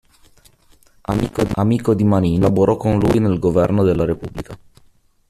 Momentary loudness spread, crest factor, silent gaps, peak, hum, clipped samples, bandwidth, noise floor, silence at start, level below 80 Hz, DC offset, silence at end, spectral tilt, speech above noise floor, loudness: 12 LU; 16 dB; none; -2 dBFS; none; under 0.1%; 13.5 kHz; -53 dBFS; 1.1 s; -38 dBFS; under 0.1%; 0.75 s; -8.5 dB/octave; 37 dB; -17 LUFS